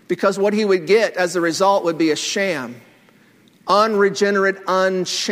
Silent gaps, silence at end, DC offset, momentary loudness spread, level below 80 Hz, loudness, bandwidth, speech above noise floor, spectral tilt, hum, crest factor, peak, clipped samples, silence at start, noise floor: none; 0 s; under 0.1%; 5 LU; -68 dBFS; -18 LUFS; 16 kHz; 35 dB; -4 dB/octave; none; 16 dB; -2 dBFS; under 0.1%; 0.1 s; -52 dBFS